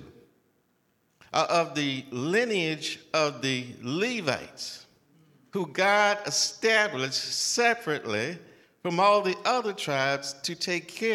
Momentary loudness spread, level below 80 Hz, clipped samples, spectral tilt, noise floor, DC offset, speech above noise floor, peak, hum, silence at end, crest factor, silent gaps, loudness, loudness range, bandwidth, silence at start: 11 LU; -76 dBFS; under 0.1%; -3 dB/octave; -70 dBFS; under 0.1%; 43 dB; -8 dBFS; none; 0 s; 20 dB; none; -26 LUFS; 4 LU; 16 kHz; 0 s